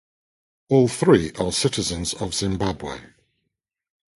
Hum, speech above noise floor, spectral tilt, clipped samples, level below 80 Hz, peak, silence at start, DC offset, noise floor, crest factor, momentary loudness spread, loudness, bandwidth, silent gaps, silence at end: none; 58 dB; -5 dB/octave; under 0.1%; -44 dBFS; -2 dBFS; 0.7 s; under 0.1%; -79 dBFS; 22 dB; 12 LU; -21 LUFS; 11.5 kHz; none; 1.1 s